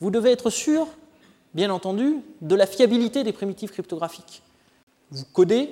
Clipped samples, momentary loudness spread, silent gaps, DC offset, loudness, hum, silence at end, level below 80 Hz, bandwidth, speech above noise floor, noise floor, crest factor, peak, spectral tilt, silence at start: under 0.1%; 14 LU; 4.83-4.87 s; under 0.1%; -23 LUFS; none; 0 s; -68 dBFS; 16.5 kHz; 33 dB; -55 dBFS; 18 dB; -6 dBFS; -5 dB/octave; 0 s